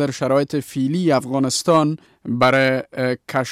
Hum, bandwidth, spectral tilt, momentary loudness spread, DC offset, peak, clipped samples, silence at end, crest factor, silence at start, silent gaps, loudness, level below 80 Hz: none; 15.5 kHz; -5 dB/octave; 8 LU; under 0.1%; -4 dBFS; under 0.1%; 0 s; 14 dB; 0 s; none; -19 LUFS; -60 dBFS